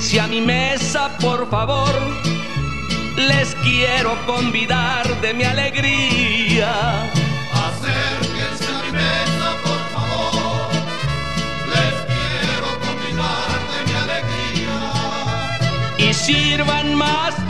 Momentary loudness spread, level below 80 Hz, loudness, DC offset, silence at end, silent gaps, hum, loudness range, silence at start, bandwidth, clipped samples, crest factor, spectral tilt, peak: 7 LU; -36 dBFS; -18 LUFS; 3%; 0 s; none; none; 4 LU; 0 s; 12.5 kHz; under 0.1%; 16 dB; -4 dB/octave; -2 dBFS